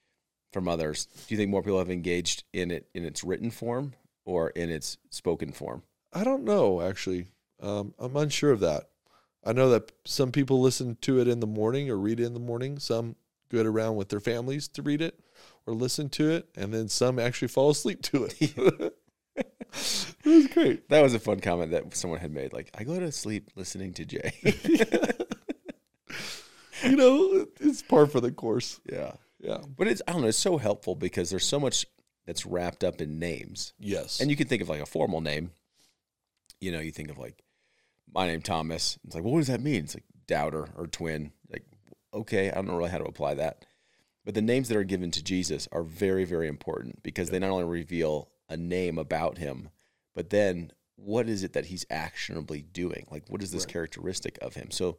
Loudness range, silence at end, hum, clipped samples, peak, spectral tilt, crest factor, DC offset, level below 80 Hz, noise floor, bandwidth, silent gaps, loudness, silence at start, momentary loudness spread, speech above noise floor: 8 LU; 0 s; none; under 0.1%; -6 dBFS; -5 dB/octave; 22 dB; 0.2%; -60 dBFS; -84 dBFS; 16.5 kHz; none; -29 LUFS; 0.55 s; 14 LU; 56 dB